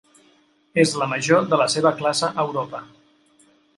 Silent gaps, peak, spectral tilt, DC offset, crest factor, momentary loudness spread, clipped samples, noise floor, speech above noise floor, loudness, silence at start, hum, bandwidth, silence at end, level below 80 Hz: none; -2 dBFS; -4 dB/octave; under 0.1%; 20 dB; 10 LU; under 0.1%; -59 dBFS; 39 dB; -20 LUFS; 0.75 s; none; 11.5 kHz; 0.9 s; -66 dBFS